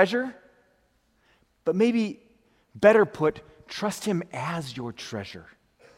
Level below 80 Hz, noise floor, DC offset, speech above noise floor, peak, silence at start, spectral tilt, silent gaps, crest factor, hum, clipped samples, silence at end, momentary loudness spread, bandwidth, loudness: -66 dBFS; -67 dBFS; under 0.1%; 42 dB; -4 dBFS; 0 s; -5.5 dB/octave; none; 22 dB; none; under 0.1%; 0.55 s; 19 LU; 16 kHz; -26 LUFS